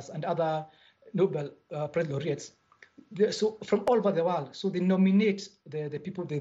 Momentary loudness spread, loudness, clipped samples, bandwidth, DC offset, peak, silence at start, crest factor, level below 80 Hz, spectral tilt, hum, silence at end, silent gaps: 13 LU; -29 LUFS; under 0.1%; 8 kHz; under 0.1%; -12 dBFS; 0 s; 16 dB; -72 dBFS; -7 dB/octave; none; 0 s; none